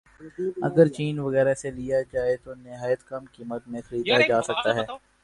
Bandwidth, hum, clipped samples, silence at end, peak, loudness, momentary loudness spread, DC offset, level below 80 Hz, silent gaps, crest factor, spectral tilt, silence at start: 11 kHz; none; under 0.1%; 0.25 s; -4 dBFS; -25 LUFS; 16 LU; under 0.1%; -56 dBFS; none; 20 dB; -5.5 dB/octave; 0.2 s